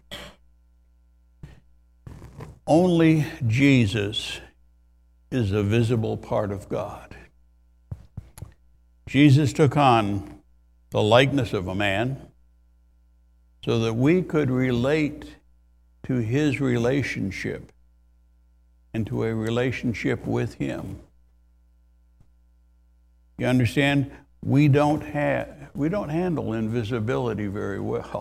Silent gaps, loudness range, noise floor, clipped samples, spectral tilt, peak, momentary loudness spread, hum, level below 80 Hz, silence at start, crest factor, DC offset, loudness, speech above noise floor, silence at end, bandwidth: none; 7 LU; -58 dBFS; under 0.1%; -7 dB/octave; -2 dBFS; 20 LU; none; -50 dBFS; 0.1 s; 22 dB; under 0.1%; -23 LUFS; 36 dB; 0 s; 14 kHz